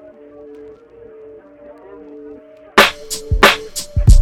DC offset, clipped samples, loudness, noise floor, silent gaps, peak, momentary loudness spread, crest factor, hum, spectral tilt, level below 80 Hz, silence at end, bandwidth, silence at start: under 0.1%; under 0.1%; -14 LUFS; -40 dBFS; none; 0 dBFS; 26 LU; 16 dB; none; -4 dB/octave; -20 dBFS; 0 s; 17 kHz; 2.25 s